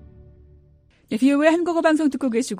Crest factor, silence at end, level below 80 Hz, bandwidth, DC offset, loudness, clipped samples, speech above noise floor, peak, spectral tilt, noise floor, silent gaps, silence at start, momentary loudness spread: 18 dB; 0 s; -54 dBFS; 13.5 kHz; under 0.1%; -20 LUFS; under 0.1%; 36 dB; -4 dBFS; -4.5 dB/octave; -55 dBFS; none; 1.1 s; 6 LU